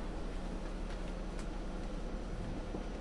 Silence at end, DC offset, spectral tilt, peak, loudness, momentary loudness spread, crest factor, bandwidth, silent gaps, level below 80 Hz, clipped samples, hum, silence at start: 0 s; under 0.1%; -6 dB/octave; -30 dBFS; -44 LUFS; 1 LU; 10 dB; 11 kHz; none; -42 dBFS; under 0.1%; none; 0 s